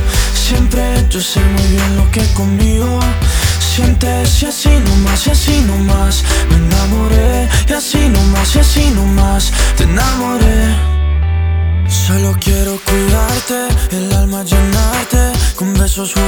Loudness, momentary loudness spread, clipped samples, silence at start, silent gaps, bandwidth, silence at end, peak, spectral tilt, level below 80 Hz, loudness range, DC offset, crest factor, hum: -12 LUFS; 3 LU; 0.1%; 0 s; none; over 20 kHz; 0 s; 0 dBFS; -4.5 dB/octave; -14 dBFS; 2 LU; under 0.1%; 10 dB; none